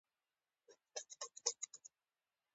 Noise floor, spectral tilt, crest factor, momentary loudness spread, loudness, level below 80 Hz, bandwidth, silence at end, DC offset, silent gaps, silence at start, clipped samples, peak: under -90 dBFS; 4 dB/octave; 34 dB; 16 LU; -46 LUFS; under -90 dBFS; 8.4 kHz; 0.7 s; under 0.1%; none; 0.7 s; under 0.1%; -18 dBFS